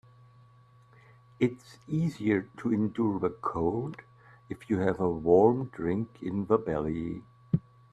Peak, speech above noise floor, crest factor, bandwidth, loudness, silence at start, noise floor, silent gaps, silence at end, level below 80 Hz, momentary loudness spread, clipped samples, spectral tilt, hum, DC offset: -8 dBFS; 30 dB; 22 dB; 10 kHz; -29 LUFS; 1.4 s; -58 dBFS; none; 0.3 s; -58 dBFS; 14 LU; under 0.1%; -9 dB/octave; none; under 0.1%